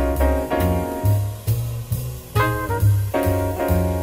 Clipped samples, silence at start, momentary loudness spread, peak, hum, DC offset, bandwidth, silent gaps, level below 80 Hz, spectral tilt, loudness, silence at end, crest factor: under 0.1%; 0 s; 6 LU; -6 dBFS; none; under 0.1%; 16 kHz; none; -30 dBFS; -7 dB/octave; -21 LUFS; 0 s; 14 dB